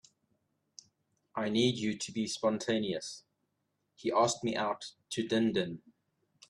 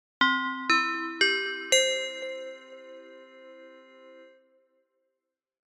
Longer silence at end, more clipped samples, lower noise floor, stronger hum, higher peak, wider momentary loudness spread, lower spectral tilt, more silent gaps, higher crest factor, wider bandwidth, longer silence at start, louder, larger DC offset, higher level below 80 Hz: second, 0.7 s vs 1.5 s; neither; second, -81 dBFS vs -85 dBFS; neither; second, -14 dBFS vs -10 dBFS; second, 12 LU vs 24 LU; first, -4.5 dB/octave vs 0.5 dB/octave; neither; about the same, 20 dB vs 22 dB; second, 12 kHz vs 15 kHz; first, 1.35 s vs 0.2 s; second, -33 LUFS vs -25 LUFS; neither; first, -72 dBFS vs -80 dBFS